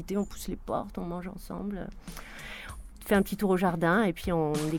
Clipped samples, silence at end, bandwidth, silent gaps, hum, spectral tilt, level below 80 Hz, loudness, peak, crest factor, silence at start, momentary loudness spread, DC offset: under 0.1%; 0 s; 19 kHz; none; none; -6 dB/octave; -46 dBFS; -30 LUFS; -12 dBFS; 18 dB; 0 s; 17 LU; under 0.1%